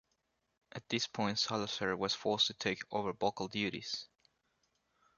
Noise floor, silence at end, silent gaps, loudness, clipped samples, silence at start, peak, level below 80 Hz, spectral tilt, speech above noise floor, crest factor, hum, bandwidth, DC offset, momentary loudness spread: -81 dBFS; 1.15 s; none; -36 LUFS; under 0.1%; 0.75 s; -16 dBFS; -70 dBFS; -3.5 dB/octave; 45 dB; 22 dB; none; 7.4 kHz; under 0.1%; 9 LU